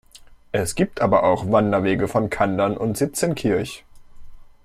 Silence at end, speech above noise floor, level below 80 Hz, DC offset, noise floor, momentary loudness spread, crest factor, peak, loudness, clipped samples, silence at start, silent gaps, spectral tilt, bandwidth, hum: 0.15 s; 27 dB; -46 dBFS; under 0.1%; -47 dBFS; 7 LU; 18 dB; -4 dBFS; -21 LUFS; under 0.1%; 0.15 s; none; -5.5 dB/octave; 15.5 kHz; none